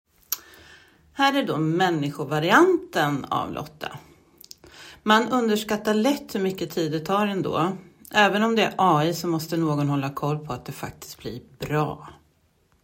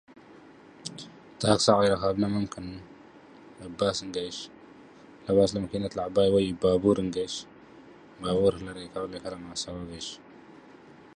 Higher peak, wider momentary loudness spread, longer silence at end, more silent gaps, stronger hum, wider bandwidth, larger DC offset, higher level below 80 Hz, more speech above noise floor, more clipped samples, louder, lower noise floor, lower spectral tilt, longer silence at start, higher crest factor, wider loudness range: first, -2 dBFS vs -6 dBFS; about the same, 17 LU vs 19 LU; first, 0.7 s vs 0.1 s; neither; neither; first, 16.5 kHz vs 10.5 kHz; neither; second, -60 dBFS vs -54 dBFS; first, 41 dB vs 25 dB; neither; first, -23 LUFS vs -27 LUFS; first, -64 dBFS vs -51 dBFS; about the same, -5 dB/octave vs -5 dB/octave; about the same, 0.3 s vs 0.3 s; about the same, 22 dB vs 22 dB; second, 3 LU vs 6 LU